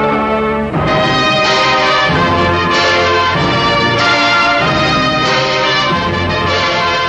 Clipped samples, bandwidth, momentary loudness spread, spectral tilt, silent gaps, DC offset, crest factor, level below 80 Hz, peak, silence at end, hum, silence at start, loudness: under 0.1%; 10 kHz; 4 LU; -4.5 dB/octave; none; under 0.1%; 12 dB; -34 dBFS; 0 dBFS; 0 s; none; 0 s; -11 LUFS